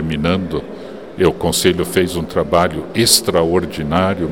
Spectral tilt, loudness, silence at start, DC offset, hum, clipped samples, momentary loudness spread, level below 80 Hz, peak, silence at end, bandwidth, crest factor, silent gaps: -4 dB/octave; -16 LUFS; 0 s; 0.7%; none; under 0.1%; 12 LU; -38 dBFS; 0 dBFS; 0 s; 17.5 kHz; 16 dB; none